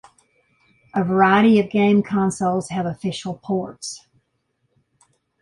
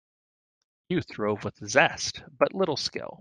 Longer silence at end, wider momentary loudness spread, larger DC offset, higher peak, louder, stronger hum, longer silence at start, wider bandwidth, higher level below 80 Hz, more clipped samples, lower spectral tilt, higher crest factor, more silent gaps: first, 1.45 s vs 0.05 s; first, 16 LU vs 10 LU; neither; about the same, -4 dBFS vs -6 dBFS; first, -19 LUFS vs -27 LUFS; neither; about the same, 0.95 s vs 0.9 s; first, 11.5 kHz vs 10 kHz; about the same, -58 dBFS vs -62 dBFS; neither; first, -6 dB/octave vs -3.5 dB/octave; second, 18 dB vs 24 dB; neither